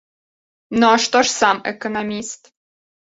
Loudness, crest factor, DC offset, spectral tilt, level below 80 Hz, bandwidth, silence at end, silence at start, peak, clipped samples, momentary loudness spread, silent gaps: -17 LUFS; 18 dB; under 0.1%; -2.5 dB/octave; -58 dBFS; 8 kHz; 0.7 s; 0.7 s; -2 dBFS; under 0.1%; 14 LU; none